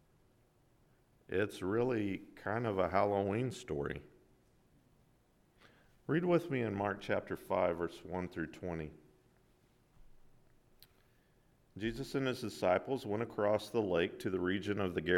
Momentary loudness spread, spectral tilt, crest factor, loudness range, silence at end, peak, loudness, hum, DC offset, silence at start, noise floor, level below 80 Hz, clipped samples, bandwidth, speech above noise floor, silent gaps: 10 LU; -6.5 dB/octave; 22 dB; 11 LU; 0 s; -16 dBFS; -36 LUFS; none; under 0.1%; 1.3 s; -70 dBFS; -64 dBFS; under 0.1%; 16.5 kHz; 35 dB; none